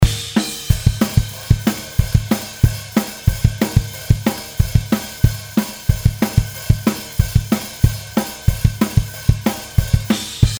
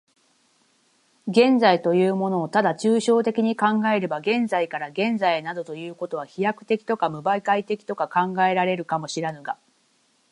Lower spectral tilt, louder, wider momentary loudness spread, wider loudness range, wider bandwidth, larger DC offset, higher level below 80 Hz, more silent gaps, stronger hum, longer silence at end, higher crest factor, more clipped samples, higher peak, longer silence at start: about the same, -5.5 dB/octave vs -5.5 dB/octave; first, -19 LUFS vs -22 LUFS; second, 4 LU vs 12 LU; second, 1 LU vs 5 LU; first, over 20 kHz vs 11 kHz; neither; first, -24 dBFS vs -74 dBFS; neither; neither; second, 0 s vs 0.75 s; about the same, 18 dB vs 20 dB; first, 0.1% vs under 0.1%; first, 0 dBFS vs -4 dBFS; second, 0 s vs 1.25 s